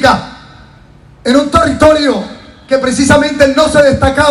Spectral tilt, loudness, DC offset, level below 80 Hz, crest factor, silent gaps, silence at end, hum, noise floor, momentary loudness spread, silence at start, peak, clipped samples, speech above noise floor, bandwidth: -4.5 dB/octave; -10 LUFS; under 0.1%; -30 dBFS; 10 dB; none; 0 s; none; -39 dBFS; 10 LU; 0 s; 0 dBFS; 2%; 30 dB; 14 kHz